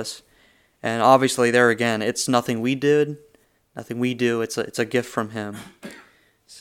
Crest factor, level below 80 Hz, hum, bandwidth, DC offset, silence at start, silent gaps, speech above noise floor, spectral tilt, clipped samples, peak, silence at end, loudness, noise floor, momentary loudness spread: 22 dB; -68 dBFS; none; 17 kHz; under 0.1%; 0 s; none; 37 dB; -4.5 dB/octave; under 0.1%; 0 dBFS; 0 s; -21 LUFS; -59 dBFS; 23 LU